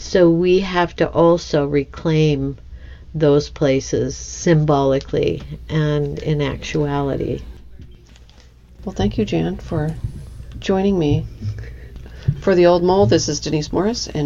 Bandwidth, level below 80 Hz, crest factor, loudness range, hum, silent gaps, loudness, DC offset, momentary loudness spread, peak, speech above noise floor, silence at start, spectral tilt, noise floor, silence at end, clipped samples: 7.6 kHz; -36 dBFS; 16 dB; 6 LU; none; none; -18 LUFS; under 0.1%; 15 LU; -2 dBFS; 27 dB; 0 s; -6 dB/octave; -45 dBFS; 0 s; under 0.1%